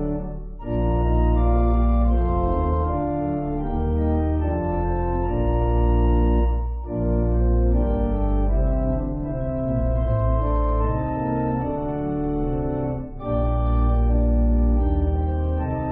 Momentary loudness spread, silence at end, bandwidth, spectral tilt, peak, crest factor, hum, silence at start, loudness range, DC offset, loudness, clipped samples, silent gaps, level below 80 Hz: 6 LU; 0 s; 3.3 kHz; -10 dB/octave; -8 dBFS; 12 dB; none; 0 s; 2 LU; under 0.1%; -23 LUFS; under 0.1%; none; -22 dBFS